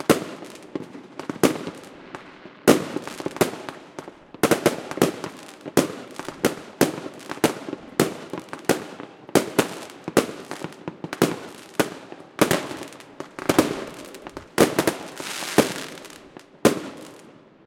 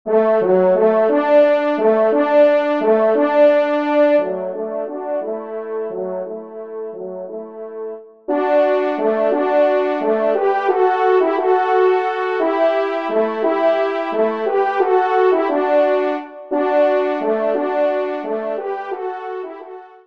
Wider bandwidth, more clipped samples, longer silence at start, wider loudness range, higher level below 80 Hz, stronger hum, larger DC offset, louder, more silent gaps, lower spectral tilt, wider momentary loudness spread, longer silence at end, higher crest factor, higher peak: first, 17 kHz vs 6 kHz; neither; about the same, 0 s vs 0.05 s; second, 2 LU vs 8 LU; first, -60 dBFS vs -72 dBFS; neither; second, under 0.1% vs 0.2%; second, -24 LUFS vs -17 LUFS; neither; second, -4 dB/octave vs -7 dB/octave; first, 19 LU vs 15 LU; first, 0.35 s vs 0.2 s; first, 26 dB vs 14 dB; about the same, 0 dBFS vs -2 dBFS